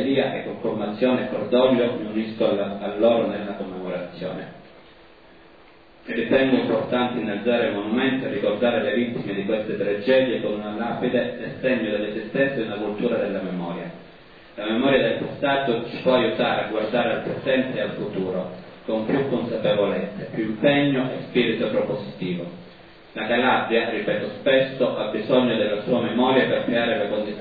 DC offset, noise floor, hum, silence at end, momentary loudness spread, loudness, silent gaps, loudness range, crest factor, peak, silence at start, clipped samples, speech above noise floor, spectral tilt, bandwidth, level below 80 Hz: 0.2%; -50 dBFS; none; 0 s; 10 LU; -23 LUFS; none; 4 LU; 18 dB; -4 dBFS; 0 s; under 0.1%; 28 dB; -9 dB/octave; 5 kHz; -60 dBFS